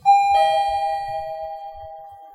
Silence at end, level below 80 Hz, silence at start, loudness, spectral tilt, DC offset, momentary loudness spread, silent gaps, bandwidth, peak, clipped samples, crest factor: 0.05 s; -52 dBFS; 0.05 s; -20 LUFS; -1.5 dB/octave; under 0.1%; 22 LU; none; 13 kHz; -6 dBFS; under 0.1%; 14 dB